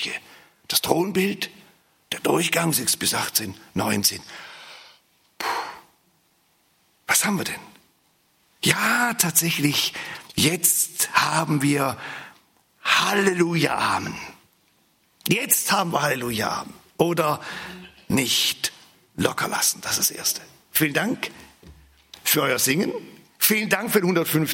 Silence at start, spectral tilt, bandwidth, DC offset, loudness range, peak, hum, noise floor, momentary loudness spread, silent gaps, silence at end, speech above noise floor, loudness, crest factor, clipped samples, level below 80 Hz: 0 s; -2.5 dB/octave; 16.5 kHz; under 0.1%; 7 LU; 0 dBFS; none; -64 dBFS; 15 LU; none; 0 s; 41 dB; -22 LUFS; 24 dB; under 0.1%; -62 dBFS